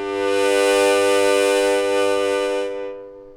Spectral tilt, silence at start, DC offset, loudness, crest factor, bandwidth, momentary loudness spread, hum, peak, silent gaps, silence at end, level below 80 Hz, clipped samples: -2 dB/octave; 0 s; under 0.1%; -18 LUFS; 14 dB; 17 kHz; 12 LU; none; -6 dBFS; none; 0 s; -56 dBFS; under 0.1%